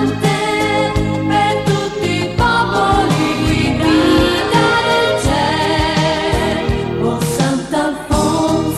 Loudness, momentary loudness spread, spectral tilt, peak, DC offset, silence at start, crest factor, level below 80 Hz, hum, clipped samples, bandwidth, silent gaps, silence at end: -15 LUFS; 5 LU; -5 dB/octave; 0 dBFS; under 0.1%; 0 s; 14 dB; -30 dBFS; none; under 0.1%; 14.5 kHz; none; 0 s